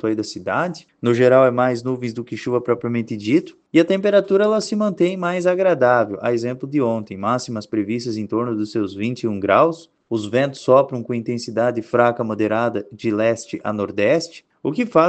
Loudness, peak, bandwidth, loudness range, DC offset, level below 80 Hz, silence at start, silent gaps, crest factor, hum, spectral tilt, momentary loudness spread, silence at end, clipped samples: -20 LUFS; 0 dBFS; 8.8 kHz; 3 LU; under 0.1%; -64 dBFS; 0.05 s; none; 18 dB; none; -6.5 dB/octave; 9 LU; 0 s; under 0.1%